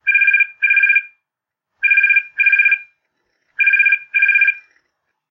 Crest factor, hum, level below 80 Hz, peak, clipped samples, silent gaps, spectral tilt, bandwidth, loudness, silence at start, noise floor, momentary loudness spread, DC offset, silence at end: 14 dB; none; -76 dBFS; -2 dBFS; under 0.1%; none; 0.5 dB/octave; 5 kHz; -12 LUFS; 0.05 s; -82 dBFS; 7 LU; under 0.1%; 0.7 s